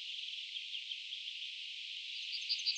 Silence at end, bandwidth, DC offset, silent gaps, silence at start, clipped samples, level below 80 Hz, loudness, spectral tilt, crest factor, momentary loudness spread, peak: 0 s; 10 kHz; under 0.1%; none; 0 s; under 0.1%; under -90 dBFS; -40 LUFS; 10 dB/octave; 18 dB; 5 LU; -24 dBFS